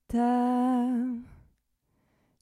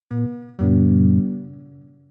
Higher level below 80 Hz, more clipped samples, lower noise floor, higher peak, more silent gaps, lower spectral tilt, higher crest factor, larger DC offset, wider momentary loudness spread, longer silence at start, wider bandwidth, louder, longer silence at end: second, -58 dBFS vs -50 dBFS; neither; first, -74 dBFS vs -45 dBFS; second, -16 dBFS vs -6 dBFS; neither; second, -7 dB/octave vs -13.5 dB/octave; about the same, 14 dB vs 14 dB; neither; second, 9 LU vs 15 LU; about the same, 0.1 s vs 0.1 s; first, 11 kHz vs 2.1 kHz; second, -27 LUFS vs -19 LUFS; first, 1.05 s vs 0.45 s